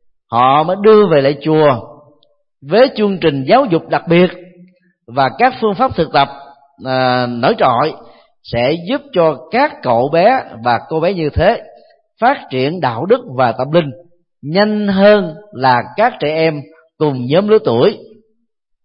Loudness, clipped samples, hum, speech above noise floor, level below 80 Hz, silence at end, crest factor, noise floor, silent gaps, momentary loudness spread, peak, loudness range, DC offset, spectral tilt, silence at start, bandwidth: -13 LUFS; under 0.1%; none; 54 dB; -42 dBFS; 0.8 s; 14 dB; -66 dBFS; none; 8 LU; 0 dBFS; 3 LU; under 0.1%; -10 dB/octave; 0.3 s; 5.6 kHz